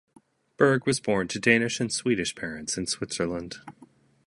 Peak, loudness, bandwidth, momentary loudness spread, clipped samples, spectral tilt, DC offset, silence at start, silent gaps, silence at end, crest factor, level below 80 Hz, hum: -4 dBFS; -26 LUFS; 11.5 kHz; 12 LU; under 0.1%; -4 dB/octave; under 0.1%; 0.6 s; none; 0.4 s; 22 dB; -58 dBFS; none